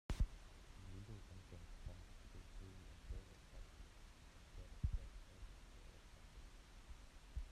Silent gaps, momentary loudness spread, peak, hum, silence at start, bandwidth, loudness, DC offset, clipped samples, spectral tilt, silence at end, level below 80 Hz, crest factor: none; 15 LU; -28 dBFS; none; 0.1 s; 13.5 kHz; -56 LUFS; under 0.1%; under 0.1%; -5.5 dB/octave; 0 s; -52 dBFS; 24 dB